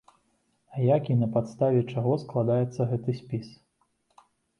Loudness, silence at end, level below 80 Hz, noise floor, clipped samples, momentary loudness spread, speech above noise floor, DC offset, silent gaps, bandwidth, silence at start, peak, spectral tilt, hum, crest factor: -27 LUFS; 1.05 s; -64 dBFS; -72 dBFS; under 0.1%; 9 LU; 46 dB; under 0.1%; none; 6.8 kHz; 0.7 s; -10 dBFS; -9.5 dB/octave; none; 18 dB